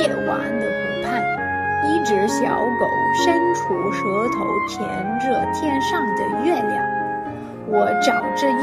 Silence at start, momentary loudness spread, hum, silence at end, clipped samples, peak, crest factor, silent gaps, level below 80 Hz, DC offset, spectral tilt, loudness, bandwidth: 0 s; 6 LU; none; 0 s; under 0.1%; -4 dBFS; 16 dB; none; -54 dBFS; under 0.1%; -5 dB/octave; -20 LUFS; 14.5 kHz